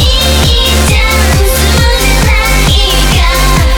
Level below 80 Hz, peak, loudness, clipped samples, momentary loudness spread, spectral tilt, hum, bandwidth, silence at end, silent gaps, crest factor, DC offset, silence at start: -10 dBFS; 0 dBFS; -8 LUFS; under 0.1%; 1 LU; -3.5 dB/octave; none; over 20 kHz; 0 s; none; 8 dB; under 0.1%; 0 s